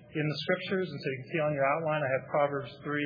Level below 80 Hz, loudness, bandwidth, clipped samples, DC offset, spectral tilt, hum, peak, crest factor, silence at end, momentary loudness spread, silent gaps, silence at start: -72 dBFS; -31 LUFS; 5.2 kHz; under 0.1%; under 0.1%; -8 dB/octave; none; -14 dBFS; 18 dB; 0 s; 7 LU; none; 0 s